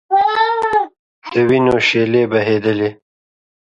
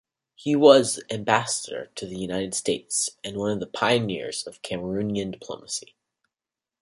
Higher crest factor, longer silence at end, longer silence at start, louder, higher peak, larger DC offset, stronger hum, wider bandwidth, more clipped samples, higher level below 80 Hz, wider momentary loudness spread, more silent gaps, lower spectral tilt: second, 14 dB vs 24 dB; second, 0.7 s vs 1 s; second, 0.1 s vs 0.4 s; first, -15 LUFS vs -24 LUFS; about the same, -2 dBFS vs -2 dBFS; neither; neither; second, 8.4 kHz vs 11.5 kHz; neither; first, -52 dBFS vs -60 dBFS; second, 8 LU vs 15 LU; first, 0.99-1.22 s vs none; first, -6 dB/octave vs -3.5 dB/octave